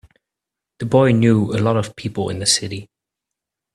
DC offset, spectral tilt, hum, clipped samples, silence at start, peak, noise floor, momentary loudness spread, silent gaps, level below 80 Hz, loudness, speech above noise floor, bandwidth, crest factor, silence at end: under 0.1%; -5 dB/octave; none; under 0.1%; 0.8 s; -2 dBFS; -85 dBFS; 15 LU; none; -52 dBFS; -17 LUFS; 67 dB; 13 kHz; 18 dB; 0.9 s